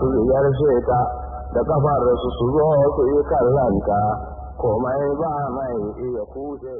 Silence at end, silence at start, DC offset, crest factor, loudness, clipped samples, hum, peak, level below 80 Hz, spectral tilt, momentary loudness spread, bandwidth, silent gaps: 0 s; 0 s; under 0.1%; 12 dB; -20 LUFS; under 0.1%; none; -8 dBFS; -36 dBFS; -13 dB/octave; 11 LU; 3.7 kHz; none